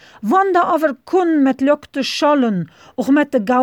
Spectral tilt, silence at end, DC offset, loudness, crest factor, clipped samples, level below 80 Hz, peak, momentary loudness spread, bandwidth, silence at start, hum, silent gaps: -5.5 dB/octave; 0 s; under 0.1%; -16 LUFS; 12 dB; under 0.1%; -62 dBFS; -4 dBFS; 7 LU; 17 kHz; 0.2 s; none; none